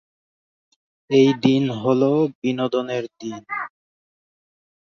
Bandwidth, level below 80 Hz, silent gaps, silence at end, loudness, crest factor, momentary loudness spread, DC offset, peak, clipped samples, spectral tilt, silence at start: 7 kHz; -66 dBFS; 2.35-2.42 s; 1.15 s; -20 LUFS; 20 dB; 13 LU; under 0.1%; -2 dBFS; under 0.1%; -7 dB/octave; 1.1 s